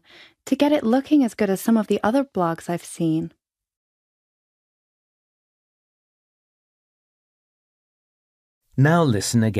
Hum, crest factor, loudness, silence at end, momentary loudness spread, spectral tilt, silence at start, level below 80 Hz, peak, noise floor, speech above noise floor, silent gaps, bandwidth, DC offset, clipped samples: none; 20 dB; -21 LUFS; 0 s; 10 LU; -6 dB/octave; 0.45 s; -64 dBFS; -4 dBFS; -44 dBFS; 24 dB; 3.77-8.61 s; 15.5 kHz; under 0.1%; under 0.1%